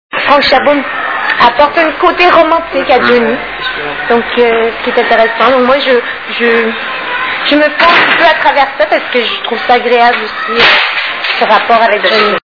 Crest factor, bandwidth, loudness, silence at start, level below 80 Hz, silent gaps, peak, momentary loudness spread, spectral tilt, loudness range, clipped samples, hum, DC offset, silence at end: 10 dB; 5.4 kHz; -8 LUFS; 0.1 s; -42 dBFS; none; 0 dBFS; 8 LU; -4.5 dB/octave; 2 LU; 2%; none; 0.5%; 0.15 s